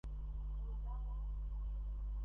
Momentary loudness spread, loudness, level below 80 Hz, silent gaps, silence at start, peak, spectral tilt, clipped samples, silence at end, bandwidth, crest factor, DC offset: 1 LU; -46 LUFS; -42 dBFS; none; 0.05 s; -36 dBFS; -9.5 dB/octave; under 0.1%; 0 s; 3.2 kHz; 6 dB; under 0.1%